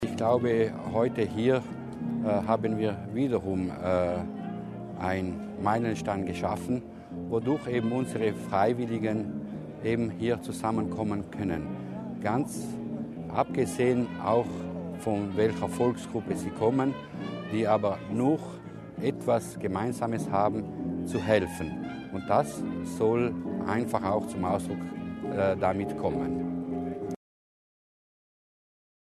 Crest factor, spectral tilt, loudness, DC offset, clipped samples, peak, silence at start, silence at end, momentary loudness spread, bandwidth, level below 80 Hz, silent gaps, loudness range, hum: 20 dB; -7 dB/octave; -30 LUFS; under 0.1%; under 0.1%; -10 dBFS; 0 s; 2.05 s; 10 LU; 13.5 kHz; -58 dBFS; none; 3 LU; none